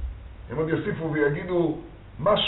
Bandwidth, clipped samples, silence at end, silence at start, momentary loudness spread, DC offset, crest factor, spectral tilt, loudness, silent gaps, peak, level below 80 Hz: 4.1 kHz; under 0.1%; 0 s; 0 s; 14 LU; under 0.1%; 16 dB; -4 dB/octave; -26 LUFS; none; -10 dBFS; -42 dBFS